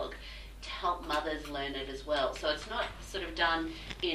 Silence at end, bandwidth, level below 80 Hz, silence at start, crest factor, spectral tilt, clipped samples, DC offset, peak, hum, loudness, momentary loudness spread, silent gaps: 0 s; 15.5 kHz; -48 dBFS; 0 s; 18 dB; -3.5 dB/octave; under 0.1%; under 0.1%; -16 dBFS; none; -34 LUFS; 11 LU; none